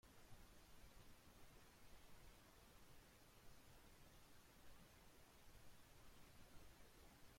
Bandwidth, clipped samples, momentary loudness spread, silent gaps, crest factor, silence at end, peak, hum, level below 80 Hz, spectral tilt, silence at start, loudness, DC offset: 16.5 kHz; under 0.1%; 1 LU; none; 14 dB; 0 s; -50 dBFS; none; -72 dBFS; -3.5 dB/octave; 0.05 s; -69 LUFS; under 0.1%